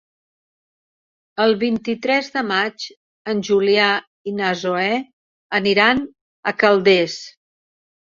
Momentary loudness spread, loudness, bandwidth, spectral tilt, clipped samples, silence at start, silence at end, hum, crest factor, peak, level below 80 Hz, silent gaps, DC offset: 17 LU; -18 LUFS; 7.6 kHz; -4.5 dB/octave; under 0.1%; 1.35 s; 0.9 s; none; 18 dB; -2 dBFS; -62 dBFS; 2.97-3.25 s, 4.07-4.25 s, 5.13-5.50 s, 6.21-6.43 s; under 0.1%